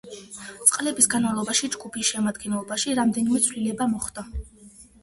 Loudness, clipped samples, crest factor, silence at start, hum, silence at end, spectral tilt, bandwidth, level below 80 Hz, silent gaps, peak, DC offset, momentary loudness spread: -23 LUFS; under 0.1%; 24 dB; 0.05 s; none; 0.2 s; -2.5 dB/octave; 12 kHz; -46 dBFS; none; -2 dBFS; under 0.1%; 18 LU